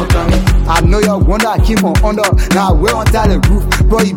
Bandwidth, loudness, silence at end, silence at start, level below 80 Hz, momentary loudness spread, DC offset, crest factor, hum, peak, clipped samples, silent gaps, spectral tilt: 17 kHz; -12 LUFS; 0 s; 0 s; -14 dBFS; 1 LU; under 0.1%; 10 dB; none; 0 dBFS; under 0.1%; none; -5.5 dB/octave